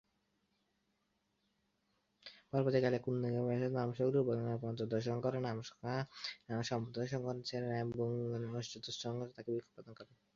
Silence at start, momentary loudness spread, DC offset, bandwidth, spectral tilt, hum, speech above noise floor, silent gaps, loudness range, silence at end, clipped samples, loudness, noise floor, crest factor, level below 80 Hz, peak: 2.25 s; 10 LU; under 0.1%; 7.4 kHz; -6 dB/octave; none; 44 dB; none; 4 LU; 0.3 s; under 0.1%; -39 LUFS; -82 dBFS; 20 dB; -74 dBFS; -18 dBFS